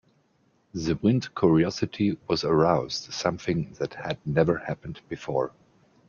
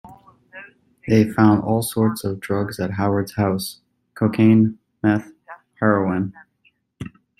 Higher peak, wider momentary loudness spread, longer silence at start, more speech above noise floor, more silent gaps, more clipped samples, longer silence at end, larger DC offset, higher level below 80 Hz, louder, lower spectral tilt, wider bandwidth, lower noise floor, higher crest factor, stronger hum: second, -8 dBFS vs -2 dBFS; second, 12 LU vs 22 LU; first, 0.75 s vs 0.05 s; second, 41 dB vs 45 dB; neither; neither; first, 0.6 s vs 0.3 s; neither; about the same, -54 dBFS vs -54 dBFS; second, -26 LUFS vs -20 LUFS; about the same, -6.5 dB/octave vs -7 dB/octave; second, 7.2 kHz vs 15 kHz; about the same, -66 dBFS vs -63 dBFS; about the same, 20 dB vs 18 dB; neither